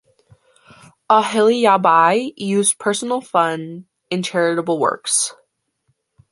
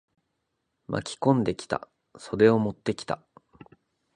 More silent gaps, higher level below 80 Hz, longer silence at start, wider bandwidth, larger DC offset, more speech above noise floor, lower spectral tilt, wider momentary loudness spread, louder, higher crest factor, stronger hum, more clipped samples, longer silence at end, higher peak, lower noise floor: neither; second, -68 dBFS vs -60 dBFS; first, 1.1 s vs 0.9 s; about the same, 11.5 kHz vs 10.5 kHz; neither; about the same, 51 dB vs 54 dB; second, -3 dB/octave vs -6.5 dB/octave; second, 11 LU vs 14 LU; first, -17 LUFS vs -26 LUFS; about the same, 18 dB vs 22 dB; neither; neither; about the same, 1 s vs 1 s; first, -2 dBFS vs -6 dBFS; second, -68 dBFS vs -79 dBFS